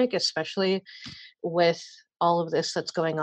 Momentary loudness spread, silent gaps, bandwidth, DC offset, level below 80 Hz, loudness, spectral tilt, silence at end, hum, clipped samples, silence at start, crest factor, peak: 17 LU; none; 9.6 kHz; under 0.1%; -70 dBFS; -27 LUFS; -4.5 dB/octave; 0 s; none; under 0.1%; 0 s; 18 dB; -8 dBFS